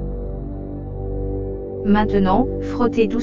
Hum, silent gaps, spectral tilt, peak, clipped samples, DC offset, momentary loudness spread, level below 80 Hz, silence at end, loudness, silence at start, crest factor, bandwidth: none; none; -8.5 dB/octave; -2 dBFS; under 0.1%; under 0.1%; 13 LU; -30 dBFS; 0 s; -21 LUFS; 0 s; 18 dB; 7.4 kHz